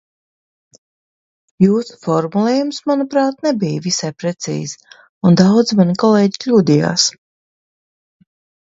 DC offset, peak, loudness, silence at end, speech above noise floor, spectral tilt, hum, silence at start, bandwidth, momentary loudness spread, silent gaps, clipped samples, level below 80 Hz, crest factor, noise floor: under 0.1%; 0 dBFS; -15 LUFS; 1.55 s; over 75 dB; -5.5 dB/octave; none; 1.6 s; 8 kHz; 11 LU; 5.09-5.21 s; under 0.1%; -60 dBFS; 16 dB; under -90 dBFS